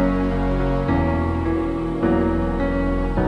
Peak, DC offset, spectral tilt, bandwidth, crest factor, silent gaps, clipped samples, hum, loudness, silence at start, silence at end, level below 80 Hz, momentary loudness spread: -8 dBFS; under 0.1%; -9 dB/octave; 8.4 kHz; 12 dB; none; under 0.1%; none; -21 LUFS; 0 s; 0 s; -26 dBFS; 3 LU